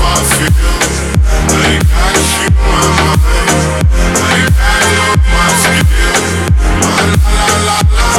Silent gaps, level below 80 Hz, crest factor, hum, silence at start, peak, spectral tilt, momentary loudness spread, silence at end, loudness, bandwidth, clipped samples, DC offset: none; -12 dBFS; 8 dB; none; 0 s; 0 dBFS; -4 dB/octave; 3 LU; 0 s; -10 LUFS; 16.5 kHz; under 0.1%; under 0.1%